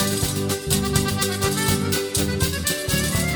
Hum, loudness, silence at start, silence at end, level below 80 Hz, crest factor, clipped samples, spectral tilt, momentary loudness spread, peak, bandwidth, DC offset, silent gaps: none; -21 LUFS; 0 s; 0 s; -36 dBFS; 18 dB; under 0.1%; -3.5 dB/octave; 2 LU; -4 dBFS; over 20 kHz; under 0.1%; none